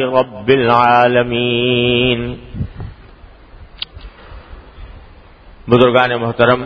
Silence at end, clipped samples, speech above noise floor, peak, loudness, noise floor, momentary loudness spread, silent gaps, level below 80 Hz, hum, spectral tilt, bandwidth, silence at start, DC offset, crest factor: 0 s; under 0.1%; 27 dB; 0 dBFS; -13 LUFS; -40 dBFS; 18 LU; none; -38 dBFS; none; -8 dB/octave; 6.2 kHz; 0 s; under 0.1%; 16 dB